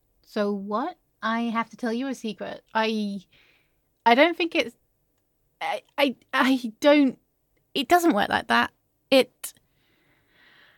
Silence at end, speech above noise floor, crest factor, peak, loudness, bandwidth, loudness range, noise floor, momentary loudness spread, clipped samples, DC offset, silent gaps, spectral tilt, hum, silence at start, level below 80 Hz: 1.3 s; 47 dB; 22 dB; -4 dBFS; -24 LUFS; 17.5 kHz; 6 LU; -71 dBFS; 14 LU; under 0.1%; under 0.1%; none; -4 dB/octave; none; 0.35 s; -66 dBFS